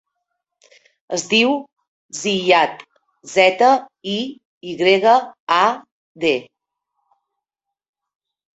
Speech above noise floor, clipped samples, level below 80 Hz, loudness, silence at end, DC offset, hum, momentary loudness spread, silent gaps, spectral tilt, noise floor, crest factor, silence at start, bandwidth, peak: 67 dB; under 0.1%; -66 dBFS; -17 LUFS; 2.1 s; under 0.1%; none; 13 LU; 1.88-2.09 s, 4.45-4.61 s, 5.40-5.47 s, 5.92-6.15 s; -3 dB/octave; -84 dBFS; 18 dB; 1.1 s; 8.2 kHz; -2 dBFS